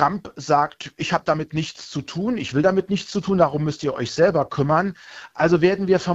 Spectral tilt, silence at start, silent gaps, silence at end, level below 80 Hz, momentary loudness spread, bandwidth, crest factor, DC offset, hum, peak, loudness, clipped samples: -6 dB/octave; 0 s; none; 0 s; -52 dBFS; 11 LU; 8 kHz; 20 dB; under 0.1%; none; -2 dBFS; -21 LUFS; under 0.1%